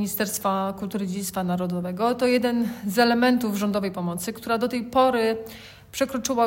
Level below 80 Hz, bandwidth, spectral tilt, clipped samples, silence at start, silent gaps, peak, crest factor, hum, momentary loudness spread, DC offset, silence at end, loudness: -58 dBFS; 16.5 kHz; -4.5 dB/octave; under 0.1%; 0 s; none; -6 dBFS; 18 dB; none; 8 LU; under 0.1%; 0 s; -24 LUFS